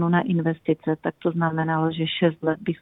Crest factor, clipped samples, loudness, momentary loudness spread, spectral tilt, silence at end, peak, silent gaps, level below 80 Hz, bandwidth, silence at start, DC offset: 16 dB; under 0.1%; -24 LUFS; 4 LU; -10 dB/octave; 0.05 s; -8 dBFS; none; -62 dBFS; 4 kHz; 0 s; under 0.1%